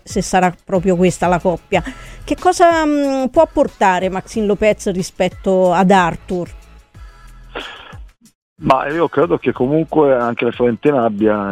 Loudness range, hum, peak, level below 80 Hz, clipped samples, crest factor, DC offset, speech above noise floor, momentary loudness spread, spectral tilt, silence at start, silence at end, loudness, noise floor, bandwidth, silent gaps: 5 LU; none; 0 dBFS; -40 dBFS; under 0.1%; 16 dB; under 0.1%; 24 dB; 12 LU; -6 dB/octave; 0.05 s; 0 s; -15 LUFS; -39 dBFS; 15 kHz; 8.35-8.56 s